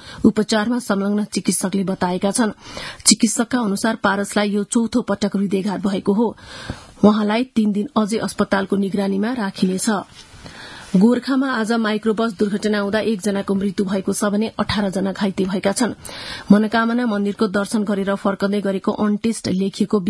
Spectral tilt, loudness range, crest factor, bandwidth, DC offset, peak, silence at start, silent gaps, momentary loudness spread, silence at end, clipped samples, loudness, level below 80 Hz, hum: -5 dB/octave; 2 LU; 20 dB; 12 kHz; under 0.1%; 0 dBFS; 0 s; none; 6 LU; 0 s; under 0.1%; -19 LUFS; -52 dBFS; none